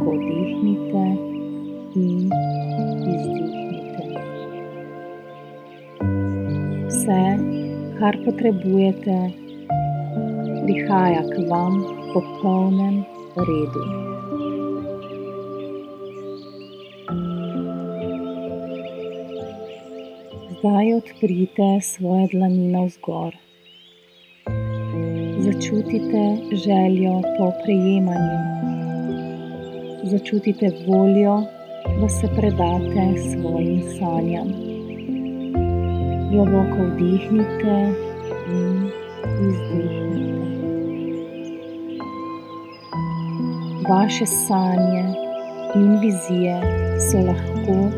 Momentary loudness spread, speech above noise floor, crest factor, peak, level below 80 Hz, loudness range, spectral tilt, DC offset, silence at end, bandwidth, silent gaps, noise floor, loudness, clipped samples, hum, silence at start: 14 LU; 32 dB; 18 dB; -4 dBFS; -42 dBFS; 9 LU; -6.5 dB/octave; under 0.1%; 0 s; 14.5 kHz; none; -51 dBFS; -22 LUFS; under 0.1%; none; 0 s